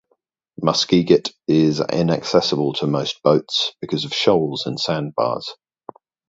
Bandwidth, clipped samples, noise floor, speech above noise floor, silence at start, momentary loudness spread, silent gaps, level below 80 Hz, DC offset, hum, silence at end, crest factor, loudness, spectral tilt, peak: 7.8 kHz; under 0.1%; -68 dBFS; 49 dB; 0.6 s; 6 LU; none; -56 dBFS; under 0.1%; none; 0.75 s; 20 dB; -19 LUFS; -5.5 dB/octave; 0 dBFS